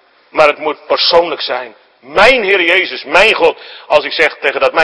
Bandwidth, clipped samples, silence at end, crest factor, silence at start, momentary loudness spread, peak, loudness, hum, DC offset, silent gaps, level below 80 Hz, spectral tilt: 11 kHz; 1%; 0 s; 12 dB; 0.35 s; 11 LU; 0 dBFS; -11 LUFS; none; under 0.1%; none; -44 dBFS; -2.5 dB/octave